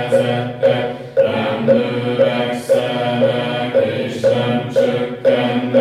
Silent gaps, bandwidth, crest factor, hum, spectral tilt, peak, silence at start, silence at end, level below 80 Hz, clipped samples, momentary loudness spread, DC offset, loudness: none; 12.5 kHz; 14 dB; none; -6.5 dB/octave; -2 dBFS; 0 s; 0 s; -58 dBFS; under 0.1%; 4 LU; under 0.1%; -17 LUFS